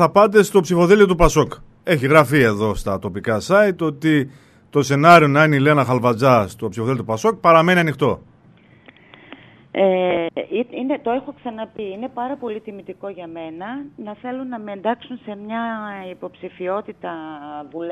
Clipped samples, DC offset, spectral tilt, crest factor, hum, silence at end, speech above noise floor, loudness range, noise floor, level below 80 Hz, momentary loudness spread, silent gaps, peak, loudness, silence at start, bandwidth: under 0.1%; under 0.1%; -6 dB/octave; 18 dB; none; 0 s; 32 dB; 13 LU; -50 dBFS; -38 dBFS; 19 LU; none; 0 dBFS; -17 LUFS; 0 s; 14 kHz